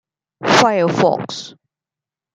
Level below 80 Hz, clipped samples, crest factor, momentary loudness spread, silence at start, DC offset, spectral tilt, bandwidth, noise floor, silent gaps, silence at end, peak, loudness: -60 dBFS; under 0.1%; 18 dB; 17 LU; 0.4 s; under 0.1%; -4.5 dB/octave; 13.5 kHz; -88 dBFS; none; 0.85 s; 0 dBFS; -15 LUFS